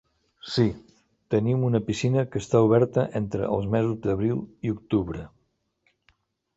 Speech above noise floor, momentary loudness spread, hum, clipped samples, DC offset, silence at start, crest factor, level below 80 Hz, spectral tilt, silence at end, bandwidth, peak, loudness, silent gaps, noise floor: 48 dB; 11 LU; none; under 0.1%; under 0.1%; 0.45 s; 20 dB; -52 dBFS; -7.5 dB/octave; 1.3 s; 8 kHz; -6 dBFS; -25 LUFS; none; -72 dBFS